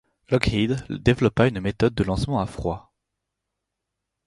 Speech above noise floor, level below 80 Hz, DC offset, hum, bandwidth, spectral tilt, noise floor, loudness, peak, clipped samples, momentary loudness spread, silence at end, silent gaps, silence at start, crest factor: 60 dB; -40 dBFS; under 0.1%; none; 11.5 kHz; -7 dB/octave; -82 dBFS; -23 LUFS; -2 dBFS; under 0.1%; 8 LU; 1.5 s; none; 0.3 s; 22 dB